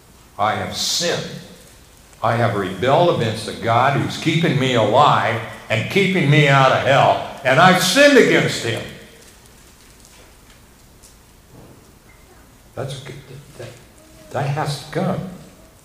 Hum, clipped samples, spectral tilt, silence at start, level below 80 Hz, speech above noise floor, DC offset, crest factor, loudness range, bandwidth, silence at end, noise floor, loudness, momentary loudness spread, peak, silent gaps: none; under 0.1%; -4.5 dB/octave; 0.4 s; -52 dBFS; 31 dB; under 0.1%; 18 dB; 23 LU; 16 kHz; 0.4 s; -47 dBFS; -16 LUFS; 21 LU; 0 dBFS; none